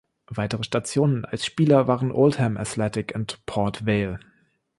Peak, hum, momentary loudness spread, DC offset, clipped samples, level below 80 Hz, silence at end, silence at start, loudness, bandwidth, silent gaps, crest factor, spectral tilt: -6 dBFS; none; 11 LU; under 0.1%; under 0.1%; -52 dBFS; 0.6 s; 0.3 s; -23 LUFS; 11.5 kHz; none; 18 dB; -6 dB/octave